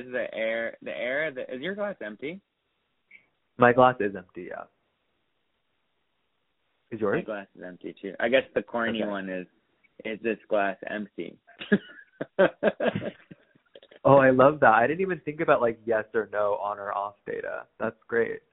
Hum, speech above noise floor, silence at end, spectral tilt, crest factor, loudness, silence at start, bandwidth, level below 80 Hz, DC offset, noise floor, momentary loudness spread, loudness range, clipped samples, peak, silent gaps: none; 51 dB; 0.15 s; -4.5 dB/octave; 24 dB; -26 LUFS; 0 s; 4 kHz; -64 dBFS; under 0.1%; -77 dBFS; 20 LU; 11 LU; under 0.1%; -4 dBFS; none